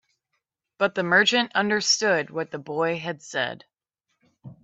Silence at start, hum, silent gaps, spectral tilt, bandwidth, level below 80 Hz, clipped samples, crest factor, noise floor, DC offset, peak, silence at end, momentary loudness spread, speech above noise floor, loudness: 0.8 s; none; none; -2.5 dB/octave; 8.4 kHz; -72 dBFS; under 0.1%; 20 dB; -79 dBFS; under 0.1%; -6 dBFS; 0.1 s; 12 LU; 55 dB; -23 LUFS